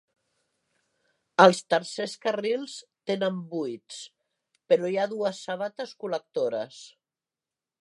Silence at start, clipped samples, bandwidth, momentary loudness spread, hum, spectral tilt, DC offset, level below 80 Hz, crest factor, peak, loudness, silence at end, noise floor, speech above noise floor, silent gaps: 1.4 s; under 0.1%; 11.5 kHz; 21 LU; none; -4.5 dB/octave; under 0.1%; -84 dBFS; 26 dB; -2 dBFS; -27 LUFS; 0.95 s; under -90 dBFS; over 63 dB; none